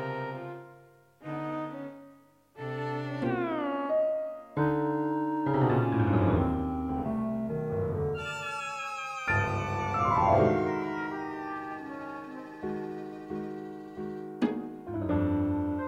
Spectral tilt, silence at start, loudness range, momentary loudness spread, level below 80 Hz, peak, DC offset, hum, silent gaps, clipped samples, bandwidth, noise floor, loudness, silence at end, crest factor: -7.5 dB/octave; 0 s; 9 LU; 14 LU; -50 dBFS; -10 dBFS; under 0.1%; none; none; under 0.1%; 10 kHz; -58 dBFS; -31 LUFS; 0 s; 20 dB